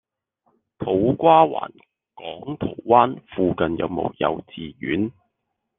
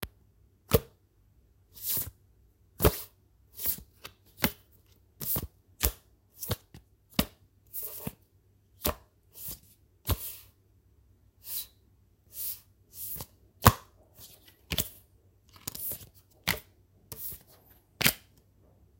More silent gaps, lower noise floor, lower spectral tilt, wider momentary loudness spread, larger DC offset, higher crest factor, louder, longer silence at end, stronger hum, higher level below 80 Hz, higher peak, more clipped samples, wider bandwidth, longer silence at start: neither; first, -78 dBFS vs -65 dBFS; first, -10 dB/octave vs -3.5 dB/octave; second, 18 LU vs 22 LU; neither; second, 20 dB vs 34 dB; first, -21 LUFS vs -32 LUFS; about the same, 0.7 s vs 0.8 s; neither; second, -54 dBFS vs -46 dBFS; about the same, -2 dBFS vs 0 dBFS; neither; second, 3.9 kHz vs 17 kHz; first, 0.8 s vs 0 s